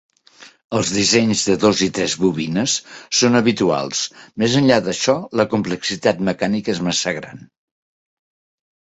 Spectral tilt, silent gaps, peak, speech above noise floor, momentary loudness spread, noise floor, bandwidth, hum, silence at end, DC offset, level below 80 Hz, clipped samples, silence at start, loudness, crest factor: -4 dB/octave; 0.64-0.70 s; -2 dBFS; 28 dB; 8 LU; -47 dBFS; 8.2 kHz; none; 1.6 s; under 0.1%; -54 dBFS; under 0.1%; 0.4 s; -18 LUFS; 18 dB